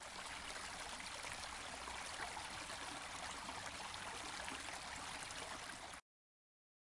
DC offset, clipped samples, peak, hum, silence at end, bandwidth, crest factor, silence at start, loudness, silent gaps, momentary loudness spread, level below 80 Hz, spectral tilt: under 0.1%; under 0.1%; -30 dBFS; none; 1 s; 11.5 kHz; 20 dB; 0 s; -47 LUFS; none; 2 LU; -66 dBFS; -1 dB/octave